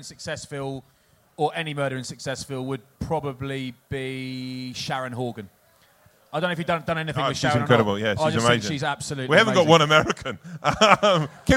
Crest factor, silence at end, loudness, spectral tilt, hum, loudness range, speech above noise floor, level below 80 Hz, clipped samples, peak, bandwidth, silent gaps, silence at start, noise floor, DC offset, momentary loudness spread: 24 dB; 0 s; -23 LUFS; -4.5 dB/octave; none; 11 LU; 35 dB; -48 dBFS; under 0.1%; 0 dBFS; 16.5 kHz; none; 0 s; -58 dBFS; under 0.1%; 16 LU